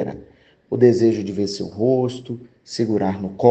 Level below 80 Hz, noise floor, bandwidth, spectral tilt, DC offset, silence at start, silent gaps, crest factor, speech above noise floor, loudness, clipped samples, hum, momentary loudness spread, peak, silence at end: -60 dBFS; -49 dBFS; 8.6 kHz; -7 dB/octave; under 0.1%; 0 s; none; 20 dB; 31 dB; -20 LUFS; under 0.1%; none; 17 LU; 0 dBFS; 0 s